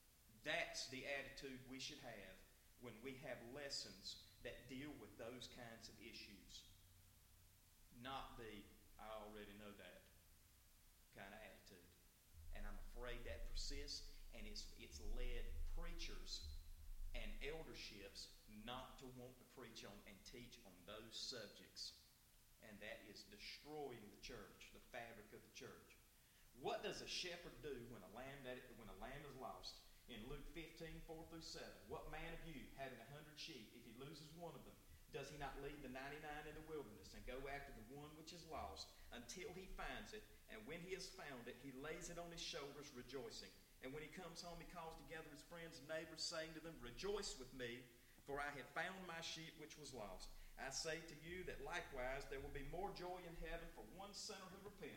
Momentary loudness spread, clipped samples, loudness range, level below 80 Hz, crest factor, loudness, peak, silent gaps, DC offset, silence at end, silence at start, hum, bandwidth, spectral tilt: 12 LU; under 0.1%; 7 LU; -60 dBFS; 24 dB; -54 LUFS; -30 dBFS; none; under 0.1%; 0 s; 0 s; none; 16.5 kHz; -3 dB/octave